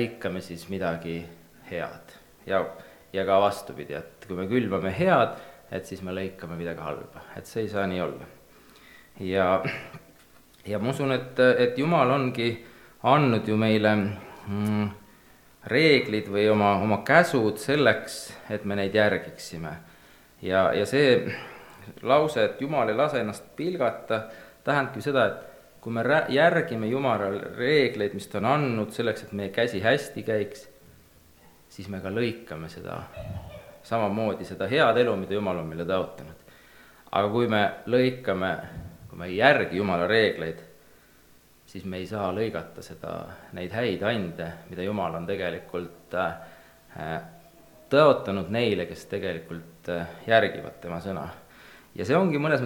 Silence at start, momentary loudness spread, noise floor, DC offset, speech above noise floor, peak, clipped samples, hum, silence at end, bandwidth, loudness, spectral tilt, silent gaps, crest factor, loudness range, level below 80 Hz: 0 s; 17 LU; -57 dBFS; under 0.1%; 31 dB; -2 dBFS; under 0.1%; none; 0 s; 19 kHz; -26 LUFS; -6 dB/octave; none; 26 dB; 9 LU; -60 dBFS